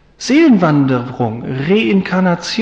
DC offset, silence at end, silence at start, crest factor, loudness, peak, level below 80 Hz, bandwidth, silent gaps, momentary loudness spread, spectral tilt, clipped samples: under 0.1%; 0 s; 0.2 s; 12 dB; -13 LUFS; -2 dBFS; -50 dBFS; 9 kHz; none; 10 LU; -6.5 dB/octave; under 0.1%